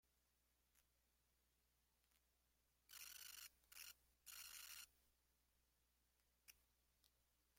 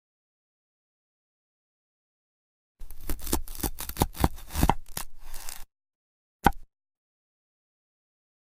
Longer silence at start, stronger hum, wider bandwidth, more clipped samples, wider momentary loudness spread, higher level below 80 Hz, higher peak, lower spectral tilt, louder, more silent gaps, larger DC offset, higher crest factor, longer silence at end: second, 0.05 s vs 2.75 s; first, 60 Hz at -85 dBFS vs none; about the same, 16.5 kHz vs 16 kHz; neither; second, 7 LU vs 15 LU; second, -88 dBFS vs -38 dBFS; second, -44 dBFS vs -6 dBFS; second, 1.5 dB/octave vs -4.5 dB/octave; second, -59 LUFS vs -30 LUFS; second, none vs 5.95-6.40 s; second, under 0.1% vs 0.3%; second, 22 dB vs 28 dB; second, 0 s vs 1.6 s